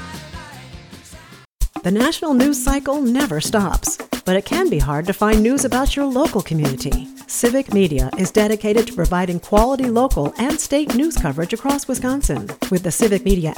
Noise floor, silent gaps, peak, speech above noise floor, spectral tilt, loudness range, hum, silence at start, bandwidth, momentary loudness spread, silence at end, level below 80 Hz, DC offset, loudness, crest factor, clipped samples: -42 dBFS; 1.45-1.59 s; -2 dBFS; 24 dB; -5 dB/octave; 2 LU; none; 0 s; 19.5 kHz; 9 LU; 0 s; -28 dBFS; under 0.1%; -18 LUFS; 16 dB; under 0.1%